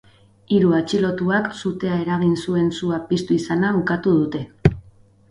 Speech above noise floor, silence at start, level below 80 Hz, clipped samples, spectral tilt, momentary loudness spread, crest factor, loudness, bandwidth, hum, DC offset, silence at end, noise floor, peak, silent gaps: 31 dB; 0.5 s; -44 dBFS; under 0.1%; -7 dB/octave; 6 LU; 20 dB; -20 LUFS; 11 kHz; none; under 0.1%; 0.5 s; -50 dBFS; 0 dBFS; none